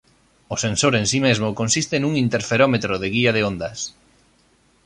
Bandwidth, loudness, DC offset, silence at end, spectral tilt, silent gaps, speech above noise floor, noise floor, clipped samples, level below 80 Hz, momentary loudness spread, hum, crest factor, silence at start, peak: 11.5 kHz; -20 LUFS; under 0.1%; 0.95 s; -4 dB/octave; none; 39 dB; -59 dBFS; under 0.1%; -50 dBFS; 10 LU; none; 18 dB; 0.5 s; -4 dBFS